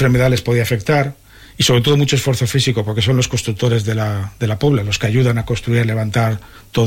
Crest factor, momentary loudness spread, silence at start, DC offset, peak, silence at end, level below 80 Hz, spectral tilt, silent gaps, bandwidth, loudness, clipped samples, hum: 12 dB; 7 LU; 0 s; under 0.1%; -2 dBFS; 0 s; -38 dBFS; -5.5 dB/octave; none; 16.5 kHz; -16 LUFS; under 0.1%; none